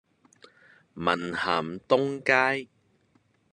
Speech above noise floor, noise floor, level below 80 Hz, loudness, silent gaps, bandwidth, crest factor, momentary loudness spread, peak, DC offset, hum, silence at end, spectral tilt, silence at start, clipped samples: 41 dB; -67 dBFS; -68 dBFS; -26 LUFS; none; 11 kHz; 22 dB; 7 LU; -6 dBFS; under 0.1%; none; 0.85 s; -5 dB/octave; 0.95 s; under 0.1%